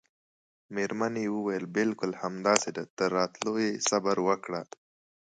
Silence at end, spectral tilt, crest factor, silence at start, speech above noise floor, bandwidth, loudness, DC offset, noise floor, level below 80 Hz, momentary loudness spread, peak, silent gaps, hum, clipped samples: 0.6 s; -3.5 dB/octave; 26 dB; 0.7 s; over 61 dB; 9.6 kHz; -30 LUFS; under 0.1%; under -90 dBFS; -74 dBFS; 9 LU; -6 dBFS; 2.90-2.97 s; none; under 0.1%